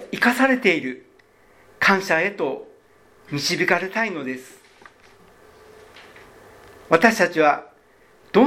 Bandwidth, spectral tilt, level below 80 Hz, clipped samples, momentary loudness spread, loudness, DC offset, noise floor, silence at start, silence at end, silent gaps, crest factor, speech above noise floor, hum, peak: 17 kHz; -4 dB/octave; -64 dBFS; under 0.1%; 15 LU; -20 LUFS; under 0.1%; -55 dBFS; 0 s; 0 s; none; 22 dB; 34 dB; none; 0 dBFS